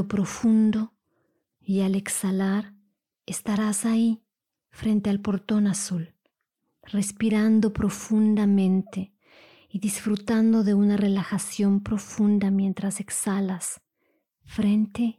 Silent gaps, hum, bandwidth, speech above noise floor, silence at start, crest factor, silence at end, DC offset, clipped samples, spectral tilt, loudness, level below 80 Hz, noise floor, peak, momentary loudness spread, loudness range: none; none; 15 kHz; 55 dB; 0 s; 10 dB; 0.05 s; under 0.1%; under 0.1%; -6 dB/octave; -24 LUFS; -56 dBFS; -79 dBFS; -14 dBFS; 12 LU; 4 LU